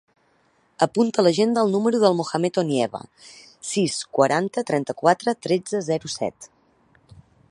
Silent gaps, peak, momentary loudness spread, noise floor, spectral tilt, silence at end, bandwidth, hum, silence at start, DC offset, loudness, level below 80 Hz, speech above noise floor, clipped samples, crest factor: none; -2 dBFS; 9 LU; -63 dBFS; -5 dB/octave; 1.05 s; 11.5 kHz; none; 0.8 s; under 0.1%; -22 LUFS; -66 dBFS; 41 dB; under 0.1%; 20 dB